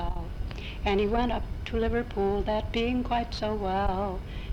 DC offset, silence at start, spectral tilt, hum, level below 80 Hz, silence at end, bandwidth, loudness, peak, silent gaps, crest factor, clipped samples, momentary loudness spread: under 0.1%; 0 s; -7 dB/octave; none; -34 dBFS; 0 s; 10.5 kHz; -30 LUFS; -12 dBFS; none; 16 dB; under 0.1%; 10 LU